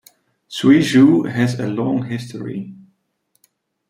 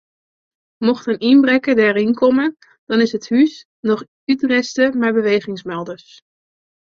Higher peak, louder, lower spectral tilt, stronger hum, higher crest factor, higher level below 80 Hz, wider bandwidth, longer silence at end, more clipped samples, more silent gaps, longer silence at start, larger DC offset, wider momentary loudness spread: about the same, -2 dBFS vs -2 dBFS; about the same, -16 LUFS vs -17 LUFS; about the same, -6.5 dB/octave vs -5.5 dB/octave; neither; about the same, 16 dB vs 14 dB; about the same, -58 dBFS vs -62 dBFS; first, 15 kHz vs 7.4 kHz; first, 1.15 s vs 0.95 s; neither; second, none vs 2.78-2.87 s, 3.65-3.83 s, 4.08-4.27 s; second, 0.5 s vs 0.8 s; neither; first, 18 LU vs 12 LU